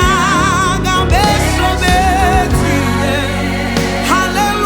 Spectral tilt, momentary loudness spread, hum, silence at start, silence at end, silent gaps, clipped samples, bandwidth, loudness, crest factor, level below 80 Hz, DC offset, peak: -4.5 dB/octave; 4 LU; none; 0 s; 0 s; none; under 0.1%; over 20 kHz; -13 LUFS; 12 dB; -22 dBFS; under 0.1%; 0 dBFS